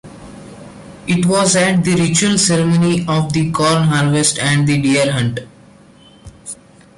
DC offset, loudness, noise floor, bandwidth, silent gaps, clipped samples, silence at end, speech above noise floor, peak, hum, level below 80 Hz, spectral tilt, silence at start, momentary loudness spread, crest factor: under 0.1%; -14 LUFS; -44 dBFS; 11.5 kHz; none; under 0.1%; 0.45 s; 30 dB; -2 dBFS; none; -46 dBFS; -4.5 dB/octave; 0.05 s; 20 LU; 14 dB